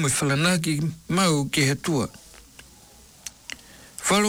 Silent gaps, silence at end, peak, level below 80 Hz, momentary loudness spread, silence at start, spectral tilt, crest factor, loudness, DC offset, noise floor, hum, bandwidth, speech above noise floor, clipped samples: none; 0 s; -12 dBFS; -54 dBFS; 19 LU; 0 s; -4 dB/octave; 14 dB; -23 LUFS; under 0.1%; -50 dBFS; none; 19.5 kHz; 27 dB; under 0.1%